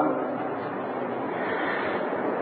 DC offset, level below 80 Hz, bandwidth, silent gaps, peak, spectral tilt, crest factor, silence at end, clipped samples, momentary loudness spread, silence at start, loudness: under 0.1%; -70 dBFS; 4.8 kHz; none; -12 dBFS; -4 dB/octave; 16 dB; 0 s; under 0.1%; 4 LU; 0 s; -29 LUFS